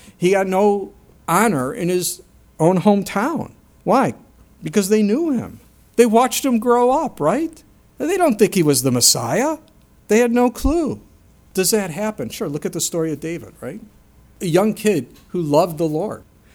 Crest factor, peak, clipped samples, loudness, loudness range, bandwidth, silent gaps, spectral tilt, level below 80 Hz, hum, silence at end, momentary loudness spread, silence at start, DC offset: 18 dB; 0 dBFS; under 0.1%; -18 LUFS; 6 LU; 19 kHz; none; -4.5 dB/octave; -42 dBFS; none; 0.35 s; 14 LU; 0.05 s; under 0.1%